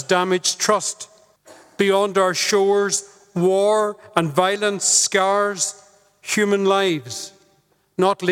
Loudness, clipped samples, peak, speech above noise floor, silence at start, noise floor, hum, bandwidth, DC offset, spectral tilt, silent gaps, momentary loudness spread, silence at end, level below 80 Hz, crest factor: -19 LUFS; under 0.1%; -2 dBFS; 42 dB; 0 s; -61 dBFS; none; 16.5 kHz; under 0.1%; -3 dB/octave; none; 14 LU; 0 s; -68 dBFS; 20 dB